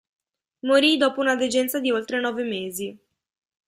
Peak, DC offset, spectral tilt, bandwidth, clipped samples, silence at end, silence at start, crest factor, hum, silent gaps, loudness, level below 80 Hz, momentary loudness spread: -6 dBFS; under 0.1%; -3 dB/octave; 15.5 kHz; under 0.1%; 0.7 s; 0.65 s; 18 dB; none; none; -22 LUFS; -70 dBFS; 14 LU